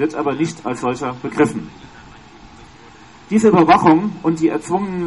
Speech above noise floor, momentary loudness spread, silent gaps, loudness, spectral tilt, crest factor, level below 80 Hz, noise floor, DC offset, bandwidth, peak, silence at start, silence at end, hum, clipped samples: 26 dB; 12 LU; none; -16 LUFS; -6.5 dB/octave; 16 dB; -50 dBFS; -42 dBFS; 0.2%; 11.5 kHz; -2 dBFS; 0 s; 0 s; none; under 0.1%